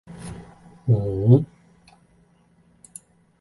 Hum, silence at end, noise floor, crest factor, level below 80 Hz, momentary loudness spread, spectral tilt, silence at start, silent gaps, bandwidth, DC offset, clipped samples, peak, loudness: none; 1.95 s; -59 dBFS; 22 dB; -48 dBFS; 25 LU; -9.5 dB/octave; 0.1 s; none; 11.5 kHz; under 0.1%; under 0.1%; -4 dBFS; -20 LUFS